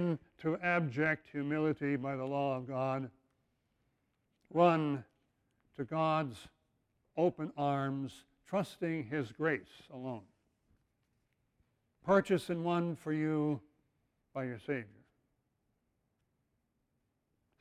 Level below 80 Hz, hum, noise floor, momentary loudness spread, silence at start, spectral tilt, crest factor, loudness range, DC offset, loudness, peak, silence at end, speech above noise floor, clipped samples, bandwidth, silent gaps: -74 dBFS; none; -81 dBFS; 15 LU; 0 s; -7.5 dB/octave; 22 dB; 7 LU; under 0.1%; -35 LUFS; -16 dBFS; 2.7 s; 47 dB; under 0.1%; 14 kHz; none